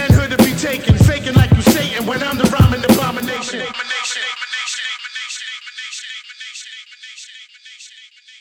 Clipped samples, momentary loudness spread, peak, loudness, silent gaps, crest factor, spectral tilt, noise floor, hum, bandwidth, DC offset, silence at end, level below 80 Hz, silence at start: under 0.1%; 22 LU; -2 dBFS; -16 LUFS; none; 14 dB; -5 dB/octave; -43 dBFS; none; 19.5 kHz; under 0.1%; 0.4 s; -32 dBFS; 0 s